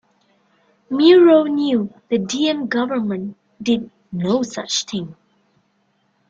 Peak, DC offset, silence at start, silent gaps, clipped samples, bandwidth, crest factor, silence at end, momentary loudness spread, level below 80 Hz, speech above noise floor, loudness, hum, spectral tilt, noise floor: -2 dBFS; under 0.1%; 0.9 s; none; under 0.1%; 7.6 kHz; 18 dB; 1.15 s; 17 LU; -62 dBFS; 47 dB; -18 LUFS; none; -4.5 dB/octave; -64 dBFS